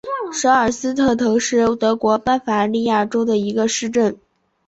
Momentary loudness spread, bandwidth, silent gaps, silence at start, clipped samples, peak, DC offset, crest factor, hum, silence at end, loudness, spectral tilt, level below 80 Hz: 3 LU; 8.2 kHz; none; 0.05 s; under 0.1%; -2 dBFS; under 0.1%; 16 dB; none; 0.55 s; -18 LUFS; -4 dB/octave; -50 dBFS